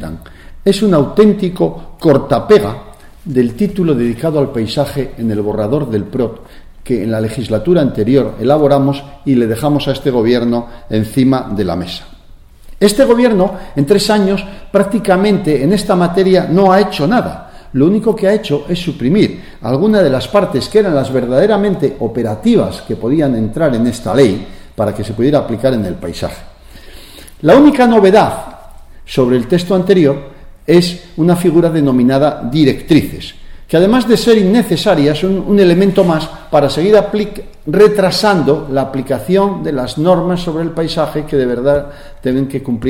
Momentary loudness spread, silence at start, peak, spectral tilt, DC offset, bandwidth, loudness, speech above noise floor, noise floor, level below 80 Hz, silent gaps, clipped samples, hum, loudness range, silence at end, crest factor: 9 LU; 0 s; 0 dBFS; -6.5 dB/octave; under 0.1%; 17 kHz; -12 LUFS; 26 dB; -38 dBFS; -34 dBFS; none; under 0.1%; none; 4 LU; 0 s; 12 dB